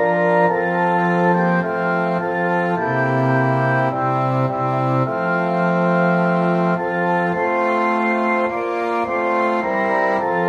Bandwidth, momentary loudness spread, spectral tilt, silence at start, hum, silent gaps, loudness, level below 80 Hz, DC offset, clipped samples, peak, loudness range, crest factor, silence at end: 7.4 kHz; 3 LU; -8.5 dB/octave; 0 s; none; none; -18 LUFS; -60 dBFS; under 0.1%; under 0.1%; -4 dBFS; 1 LU; 14 dB; 0 s